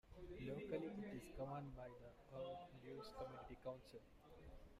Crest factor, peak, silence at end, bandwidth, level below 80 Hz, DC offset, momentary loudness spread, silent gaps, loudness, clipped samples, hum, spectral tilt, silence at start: 18 dB; -34 dBFS; 0 s; 15 kHz; -66 dBFS; under 0.1%; 15 LU; none; -54 LUFS; under 0.1%; none; -7 dB/octave; 0.05 s